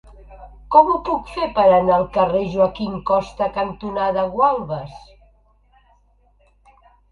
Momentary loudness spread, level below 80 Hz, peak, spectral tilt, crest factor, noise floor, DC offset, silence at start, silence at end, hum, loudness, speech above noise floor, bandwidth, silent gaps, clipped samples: 11 LU; -44 dBFS; 0 dBFS; -7.5 dB/octave; 20 dB; -57 dBFS; under 0.1%; 0.2 s; 2.15 s; none; -19 LUFS; 39 dB; 7 kHz; none; under 0.1%